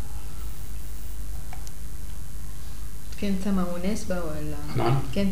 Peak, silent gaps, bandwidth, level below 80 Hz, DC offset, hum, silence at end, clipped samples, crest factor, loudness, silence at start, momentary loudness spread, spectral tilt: -12 dBFS; none; 16 kHz; -38 dBFS; 7%; none; 0 s; under 0.1%; 18 dB; -32 LUFS; 0 s; 15 LU; -6 dB/octave